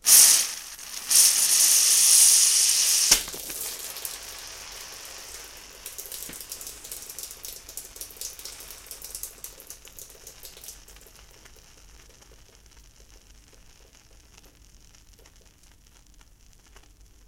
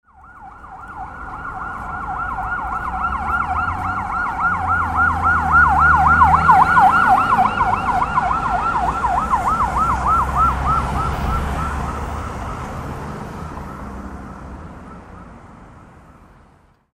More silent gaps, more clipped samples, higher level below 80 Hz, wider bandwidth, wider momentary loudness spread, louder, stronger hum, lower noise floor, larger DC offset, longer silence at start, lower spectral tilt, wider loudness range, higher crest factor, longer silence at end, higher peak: neither; neither; second, -56 dBFS vs -30 dBFS; first, 17 kHz vs 15 kHz; first, 27 LU vs 21 LU; about the same, -17 LUFS vs -17 LUFS; neither; about the same, -55 dBFS vs -52 dBFS; neither; second, 0.05 s vs 0.25 s; second, 3 dB/octave vs -6 dB/octave; first, 23 LU vs 19 LU; first, 26 dB vs 18 dB; first, 6.55 s vs 1.1 s; about the same, 0 dBFS vs 0 dBFS